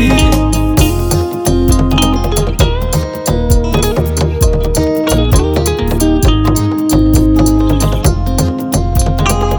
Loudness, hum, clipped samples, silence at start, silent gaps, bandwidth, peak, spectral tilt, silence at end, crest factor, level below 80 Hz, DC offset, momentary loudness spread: -12 LUFS; none; under 0.1%; 0 s; none; over 20 kHz; 0 dBFS; -5.5 dB/octave; 0 s; 10 dB; -16 dBFS; under 0.1%; 4 LU